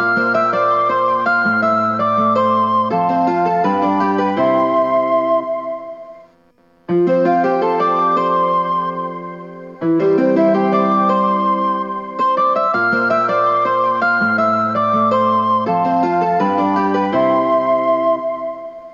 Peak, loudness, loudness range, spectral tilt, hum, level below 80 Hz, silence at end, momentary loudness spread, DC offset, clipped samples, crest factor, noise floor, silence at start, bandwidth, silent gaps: -4 dBFS; -16 LUFS; 3 LU; -8 dB/octave; none; -66 dBFS; 0 s; 8 LU; under 0.1%; under 0.1%; 12 dB; -53 dBFS; 0 s; 7.2 kHz; none